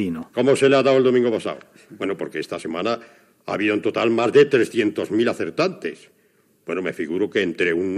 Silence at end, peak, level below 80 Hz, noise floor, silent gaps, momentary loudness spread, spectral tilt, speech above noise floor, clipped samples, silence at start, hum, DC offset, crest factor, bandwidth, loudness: 0 s; -2 dBFS; -66 dBFS; -60 dBFS; none; 14 LU; -5.5 dB/octave; 40 dB; under 0.1%; 0 s; none; under 0.1%; 18 dB; 12.5 kHz; -21 LUFS